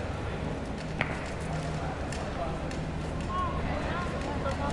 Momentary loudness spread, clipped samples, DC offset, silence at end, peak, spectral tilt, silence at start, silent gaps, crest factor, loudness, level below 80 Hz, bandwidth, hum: 3 LU; under 0.1%; under 0.1%; 0 s; -8 dBFS; -6 dB/octave; 0 s; none; 24 dB; -33 LUFS; -40 dBFS; 11.5 kHz; none